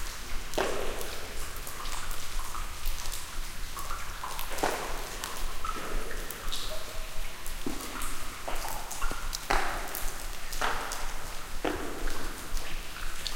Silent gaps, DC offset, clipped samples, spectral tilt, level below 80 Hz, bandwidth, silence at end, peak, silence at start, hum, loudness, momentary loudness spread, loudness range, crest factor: none; under 0.1%; under 0.1%; -2.5 dB/octave; -36 dBFS; 17 kHz; 0 s; -8 dBFS; 0 s; none; -36 LUFS; 8 LU; 3 LU; 22 dB